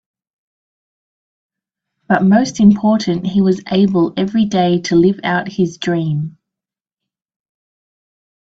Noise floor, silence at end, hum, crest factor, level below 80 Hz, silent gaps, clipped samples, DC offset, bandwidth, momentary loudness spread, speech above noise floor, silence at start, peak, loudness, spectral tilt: -87 dBFS; 2.25 s; none; 16 dB; -52 dBFS; none; under 0.1%; under 0.1%; 7.8 kHz; 7 LU; 73 dB; 2.1 s; 0 dBFS; -15 LUFS; -6.5 dB/octave